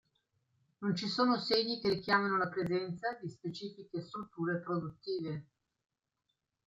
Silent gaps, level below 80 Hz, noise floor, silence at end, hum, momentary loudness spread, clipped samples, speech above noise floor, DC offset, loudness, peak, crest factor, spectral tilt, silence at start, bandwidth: none; -74 dBFS; -85 dBFS; 1.25 s; none; 12 LU; under 0.1%; 50 dB; under 0.1%; -35 LUFS; -16 dBFS; 20 dB; -6 dB/octave; 0.8 s; 14.5 kHz